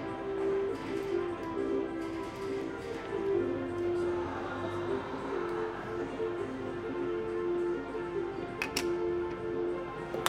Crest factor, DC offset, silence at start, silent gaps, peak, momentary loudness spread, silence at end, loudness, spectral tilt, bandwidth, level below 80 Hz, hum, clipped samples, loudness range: 26 dB; under 0.1%; 0 s; none; -8 dBFS; 5 LU; 0 s; -35 LUFS; -5.5 dB/octave; 15.5 kHz; -58 dBFS; none; under 0.1%; 1 LU